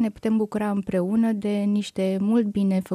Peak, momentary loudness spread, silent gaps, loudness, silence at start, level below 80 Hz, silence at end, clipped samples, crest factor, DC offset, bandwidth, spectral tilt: -10 dBFS; 3 LU; none; -24 LUFS; 0 s; -58 dBFS; 0 s; under 0.1%; 12 dB; under 0.1%; 13 kHz; -7.5 dB/octave